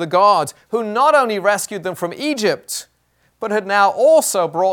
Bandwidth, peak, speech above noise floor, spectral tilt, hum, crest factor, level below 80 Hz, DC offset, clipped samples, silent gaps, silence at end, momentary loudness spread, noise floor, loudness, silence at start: 18.5 kHz; -2 dBFS; 45 dB; -3 dB/octave; none; 16 dB; -68 dBFS; under 0.1%; under 0.1%; none; 0 s; 11 LU; -61 dBFS; -16 LUFS; 0 s